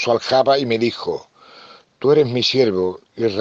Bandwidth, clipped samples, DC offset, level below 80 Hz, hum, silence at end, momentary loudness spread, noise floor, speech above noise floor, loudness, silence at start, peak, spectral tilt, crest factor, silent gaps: 7.6 kHz; under 0.1%; under 0.1%; -64 dBFS; none; 0 s; 10 LU; -45 dBFS; 28 dB; -18 LUFS; 0 s; -4 dBFS; -5.5 dB/octave; 16 dB; none